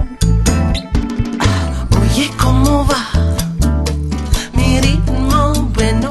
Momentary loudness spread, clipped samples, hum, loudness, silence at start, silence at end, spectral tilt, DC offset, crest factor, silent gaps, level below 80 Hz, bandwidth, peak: 5 LU; under 0.1%; none; -15 LUFS; 0 s; 0 s; -5.5 dB/octave; under 0.1%; 14 dB; none; -18 dBFS; 12.5 kHz; 0 dBFS